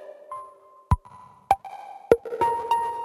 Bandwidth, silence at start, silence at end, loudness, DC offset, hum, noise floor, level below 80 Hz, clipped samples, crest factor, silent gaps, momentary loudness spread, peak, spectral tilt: 16 kHz; 0 s; 0 s; -25 LUFS; under 0.1%; none; -49 dBFS; -38 dBFS; under 0.1%; 26 dB; none; 17 LU; 0 dBFS; -7 dB/octave